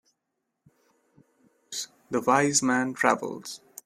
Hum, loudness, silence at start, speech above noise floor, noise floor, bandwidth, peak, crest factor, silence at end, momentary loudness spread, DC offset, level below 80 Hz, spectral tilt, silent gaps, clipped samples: none; -25 LUFS; 1.7 s; 56 dB; -81 dBFS; 15.5 kHz; -4 dBFS; 26 dB; 0.3 s; 15 LU; under 0.1%; -72 dBFS; -3 dB/octave; none; under 0.1%